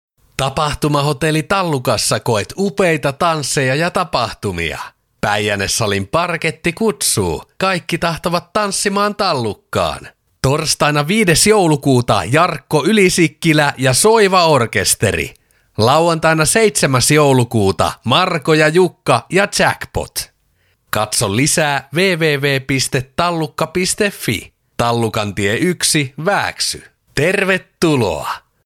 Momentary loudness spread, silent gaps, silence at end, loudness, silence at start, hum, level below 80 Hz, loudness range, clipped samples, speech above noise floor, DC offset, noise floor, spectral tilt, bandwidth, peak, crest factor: 9 LU; none; 0.3 s; -15 LUFS; 0.4 s; none; -42 dBFS; 5 LU; under 0.1%; 45 dB; under 0.1%; -60 dBFS; -4 dB/octave; 18 kHz; 0 dBFS; 16 dB